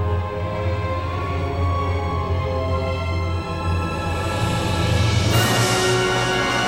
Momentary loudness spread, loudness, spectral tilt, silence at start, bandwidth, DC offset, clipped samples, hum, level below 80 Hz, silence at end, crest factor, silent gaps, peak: 7 LU; -21 LUFS; -5 dB/octave; 0 s; 16 kHz; under 0.1%; under 0.1%; none; -36 dBFS; 0 s; 16 dB; none; -6 dBFS